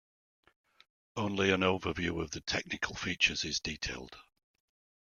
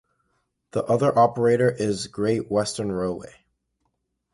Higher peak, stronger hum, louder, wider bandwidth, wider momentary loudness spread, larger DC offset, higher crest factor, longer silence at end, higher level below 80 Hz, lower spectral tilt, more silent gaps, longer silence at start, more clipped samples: second, -12 dBFS vs -6 dBFS; neither; second, -32 LUFS vs -23 LUFS; about the same, 11.5 kHz vs 11.5 kHz; about the same, 11 LU vs 11 LU; neither; first, 24 dB vs 18 dB; second, 0.9 s vs 1.1 s; about the same, -58 dBFS vs -56 dBFS; second, -3.5 dB/octave vs -6 dB/octave; neither; first, 1.15 s vs 0.75 s; neither